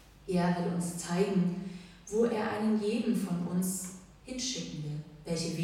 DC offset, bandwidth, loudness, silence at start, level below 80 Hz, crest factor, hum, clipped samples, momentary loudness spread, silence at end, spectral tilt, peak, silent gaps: under 0.1%; 16 kHz; -32 LUFS; 0 s; -60 dBFS; 16 dB; none; under 0.1%; 12 LU; 0 s; -5.5 dB/octave; -16 dBFS; none